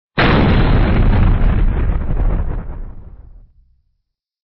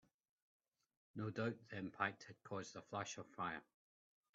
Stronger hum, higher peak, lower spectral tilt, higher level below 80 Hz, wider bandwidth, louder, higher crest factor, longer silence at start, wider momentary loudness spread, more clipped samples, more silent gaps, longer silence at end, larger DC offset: neither; first, -4 dBFS vs -24 dBFS; first, -6 dB/octave vs -4.5 dB/octave; first, -18 dBFS vs -86 dBFS; second, 5.4 kHz vs 7.4 kHz; first, -16 LUFS vs -47 LUFS; second, 10 dB vs 26 dB; second, 0.15 s vs 1.15 s; first, 16 LU vs 8 LU; neither; neither; first, 1.25 s vs 0.75 s; neither